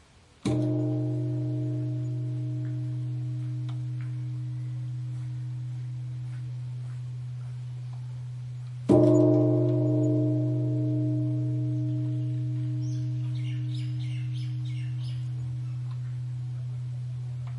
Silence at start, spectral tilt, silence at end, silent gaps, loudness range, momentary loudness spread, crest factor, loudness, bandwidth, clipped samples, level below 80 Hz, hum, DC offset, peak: 0.45 s; -9.5 dB/octave; 0 s; none; 11 LU; 12 LU; 20 dB; -30 LUFS; 7.8 kHz; under 0.1%; -62 dBFS; none; under 0.1%; -8 dBFS